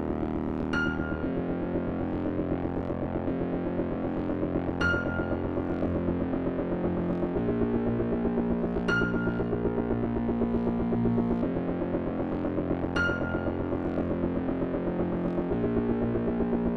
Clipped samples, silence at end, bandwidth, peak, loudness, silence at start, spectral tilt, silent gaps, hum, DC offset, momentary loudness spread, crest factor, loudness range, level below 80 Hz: under 0.1%; 0 s; 6.2 kHz; -14 dBFS; -29 LUFS; 0 s; -8.5 dB/octave; none; none; under 0.1%; 4 LU; 14 dB; 2 LU; -42 dBFS